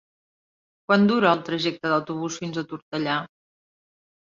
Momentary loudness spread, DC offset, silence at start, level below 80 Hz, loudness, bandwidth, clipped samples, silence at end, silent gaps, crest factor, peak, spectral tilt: 13 LU; under 0.1%; 0.9 s; -68 dBFS; -24 LUFS; 7.4 kHz; under 0.1%; 1.05 s; 2.82-2.92 s; 22 dB; -4 dBFS; -5.5 dB/octave